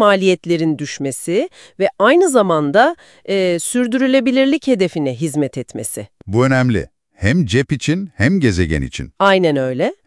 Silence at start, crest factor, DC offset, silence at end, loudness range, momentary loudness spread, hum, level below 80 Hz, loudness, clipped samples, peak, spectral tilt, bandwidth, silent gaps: 0 s; 16 dB; under 0.1%; 0.15 s; 3 LU; 10 LU; none; -42 dBFS; -16 LUFS; under 0.1%; 0 dBFS; -5.5 dB/octave; 12 kHz; none